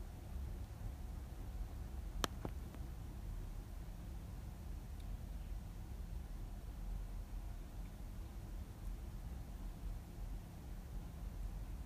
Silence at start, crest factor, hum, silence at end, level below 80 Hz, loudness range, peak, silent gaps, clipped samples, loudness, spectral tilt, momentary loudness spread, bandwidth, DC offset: 0 s; 32 dB; none; 0 s; -48 dBFS; 3 LU; -16 dBFS; none; under 0.1%; -50 LUFS; -5.5 dB/octave; 3 LU; 15.5 kHz; under 0.1%